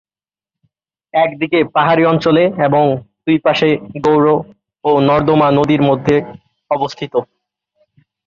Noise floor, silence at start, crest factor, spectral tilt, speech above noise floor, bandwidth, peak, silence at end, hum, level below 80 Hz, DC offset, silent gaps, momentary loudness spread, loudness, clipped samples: under -90 dBFS; 1.15 s; 14 dB; -7.5 dB/octave; over 77 dB; 7.2 kHz; -2 dBFS; 1 s; none; -50 dBFS; under 0.1%; none; 9 LU; -14 LUFS; under 0.1%